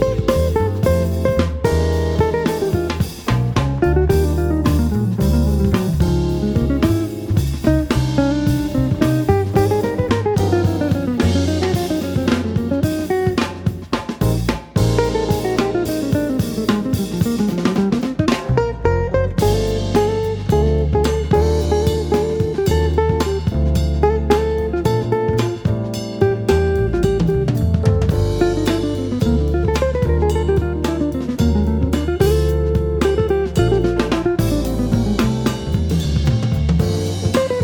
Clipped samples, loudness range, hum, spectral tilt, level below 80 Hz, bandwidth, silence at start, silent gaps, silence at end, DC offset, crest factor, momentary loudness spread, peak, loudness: under 0.1%; 2 LU; none; -7 dB/octave; -24 dBFS; 20 kHz; 0 s; none; 0 s; under 0.1%; 16 dB; 3 LU; -2 dBFS; -18 LUFS